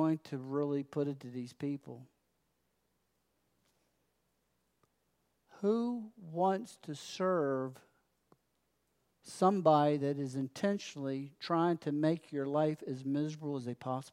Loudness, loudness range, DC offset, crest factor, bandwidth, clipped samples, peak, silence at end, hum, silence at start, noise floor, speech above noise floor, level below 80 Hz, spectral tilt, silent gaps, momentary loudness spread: -35 LUFS; 11 LU; under 0.1%; 22 dB; 13.5 kHz; under 0.1%; -14 dBFS; 0.05 s; none; 0 s; -80 dBFS; 45 dB; -86 dBFS; -7 dB/octave; none; 14 LU